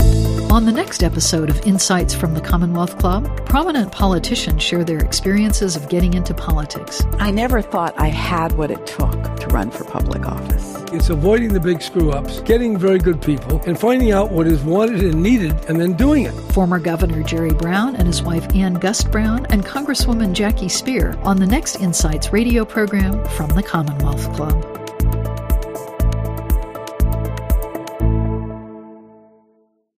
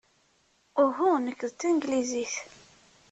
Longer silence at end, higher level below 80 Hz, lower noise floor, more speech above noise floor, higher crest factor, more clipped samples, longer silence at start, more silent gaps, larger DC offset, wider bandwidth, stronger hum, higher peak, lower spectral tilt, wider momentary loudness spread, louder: first, 0.95 s vs 0.65 s; first, -22 dBFS vs -72 dBFS; second, -59 dBFS vs -68 dBFS; about the same, 43 dB vs 40 dB; about the same, 16 dB vs 18 dB; neither; second, 0 s vs 0.75 s; neither; neither; first, 15.5 kHz vs 8.4 kHz; neither; first, 0 dBFS vs -12 dBFS; first, -5.5 dB/octave vs -3 dB/octave; second, 7 LU vs 10 LU; first, -18 LUFS vs -28 LUFS